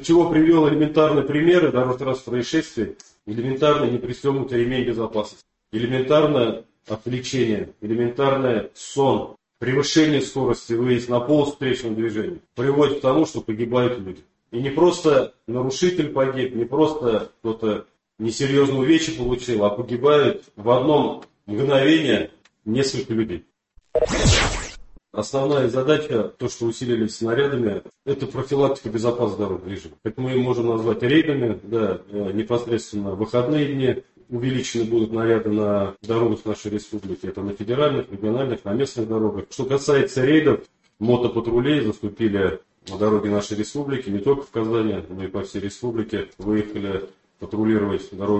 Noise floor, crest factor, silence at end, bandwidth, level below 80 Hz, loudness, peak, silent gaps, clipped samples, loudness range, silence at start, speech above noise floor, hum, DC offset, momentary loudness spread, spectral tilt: -40 dBFS; 18 dB; 0 s; 8.6 kHz; -42 dBFS; -22 LUFS; -2 dBFS; none; under 0.1%; 4 LU; 0 s; 19 dB; none; under 0.1%; 12 LU; -6 dB/octave